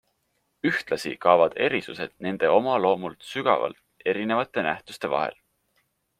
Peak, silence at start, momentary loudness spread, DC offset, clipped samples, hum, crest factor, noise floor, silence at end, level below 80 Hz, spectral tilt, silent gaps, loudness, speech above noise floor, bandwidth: -4 dBFS; 0.65 s; 11 LU; under 0.1%; under 0.1%; none; 22 dB; -73 dBFS; 0.85 s; -68 dBFS; -5.5 dB/octave; none; -25 LUFS; 49 dB; 15 kHz